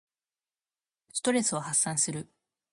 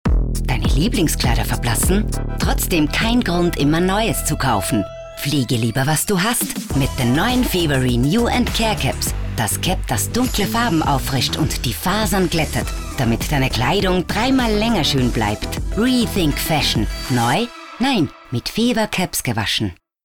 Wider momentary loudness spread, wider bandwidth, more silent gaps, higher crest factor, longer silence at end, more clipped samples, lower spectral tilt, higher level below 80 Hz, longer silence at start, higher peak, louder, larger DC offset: first, 9 LU vs 5 LU; second, 11.5 kHz vs over 20 kHz; neither; first, 20 dB vs 10 dB; first, 0.45 s vs 0.3 s; neither; second, -3 dB/octave vs -4.5 dB/octave; second, -76 dBFS vs -26 dBFS; first, 1.15 s vs 0.05 s; second, -14 dBFS vs -8 dBFS; second, -28 LUFS vs -18 LUFS; second, under 0.1% vs 0.5%